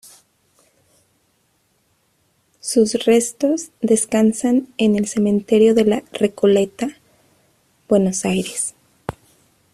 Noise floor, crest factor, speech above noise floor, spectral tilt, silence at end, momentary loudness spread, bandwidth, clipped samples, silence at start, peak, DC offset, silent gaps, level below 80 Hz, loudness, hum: -64 dBFS; 16 dB; 47 dB; -5 dB/octave; 0.6 s; 13 LU; 14 kHz; under 0.1%; 2.65 s; -2 dBFS; under 0.1%; none; -56 dBFS; -18 LUFS; none